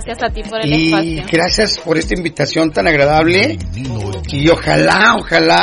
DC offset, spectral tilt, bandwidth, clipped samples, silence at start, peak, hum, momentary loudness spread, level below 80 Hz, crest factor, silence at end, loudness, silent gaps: under 0.1%; -4.5 dB/octave; 11 kHz; under 0.1%; 0 s; 0 dBFS; none; 11 LU; -30 dBFS; 12 dB; 0 s; -13 LUFS; none